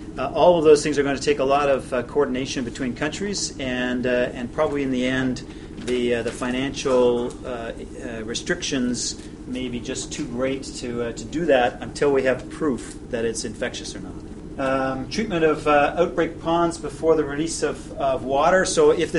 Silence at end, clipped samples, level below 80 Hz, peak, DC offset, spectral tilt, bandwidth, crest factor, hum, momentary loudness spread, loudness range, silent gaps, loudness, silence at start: 0 s; under 0.1%; -42 dBFS; -2 dBFS; under 0.1%; -4.5 dB/octave; 11.5 kHz; 20 dB; none; 13 LU; 5 LU; none; -22 LUFS; 0 s